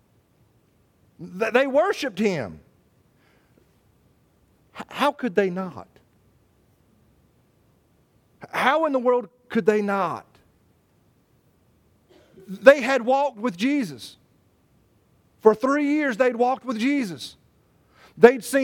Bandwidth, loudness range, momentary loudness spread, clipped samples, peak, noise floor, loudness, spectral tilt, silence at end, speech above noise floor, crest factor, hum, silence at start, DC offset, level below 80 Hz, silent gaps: 17 kHz; 7 LU; 20 LU; under 0.1%; 0 dBFS; -62 dBFS; -21 LUFS; -5 dB/octave; 0 s; 41 dB; 24 dB; none; 1.2 s; under 0.1%; -66 dBFS; none